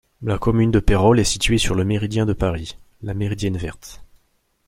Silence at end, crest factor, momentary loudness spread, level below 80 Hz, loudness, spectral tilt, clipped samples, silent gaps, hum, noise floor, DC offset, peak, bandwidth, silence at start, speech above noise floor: 0.65 s; 18 dB; 17 LU; -30 dBFS; -20 LUFS; -5.5 dB/octave; under 0.1%; none; none; -64 dBFS; under 0.1%; -2 dBFS; 15.5 kHz; 0.2 s; 46 dB